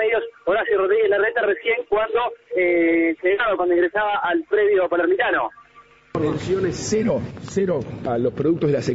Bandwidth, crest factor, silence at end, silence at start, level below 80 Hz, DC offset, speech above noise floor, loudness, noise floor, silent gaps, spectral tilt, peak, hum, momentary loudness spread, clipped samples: 8 kHz; 12 dB; 0 s; 0 s; -52 dBFS; under 0.1%; 30 dB; -21 LUFS; -50 dBFS; none; -5.5 dB/octave; -8 dBFS; none; 6 LU; under 0.1%